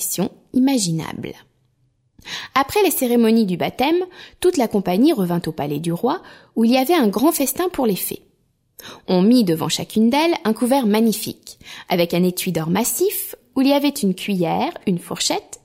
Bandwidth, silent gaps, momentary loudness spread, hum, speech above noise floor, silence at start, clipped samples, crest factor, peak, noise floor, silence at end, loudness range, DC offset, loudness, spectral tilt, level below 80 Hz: 16.5 kHz; none; 12 LU; none; 45 dB; 0 s; under 0.1%; 16 dB; -4 dBFS; -64 dBFS; 0.1 s; 2 LU; under 0.1%; -19 LUFS; -5 dB/octave; -56 dBFS